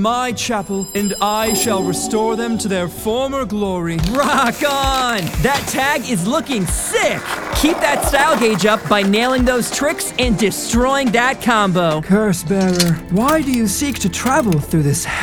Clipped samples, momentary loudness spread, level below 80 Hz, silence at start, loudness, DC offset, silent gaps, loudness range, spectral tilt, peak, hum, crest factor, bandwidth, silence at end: under 0.1%; 6 LU; -32 dBFS; 0 s; -16 LUFS; 0.2%; none; 3 LU; -4 dB/octave; 0 dBFS; none; 16 dB; over 20 kHz; 0 s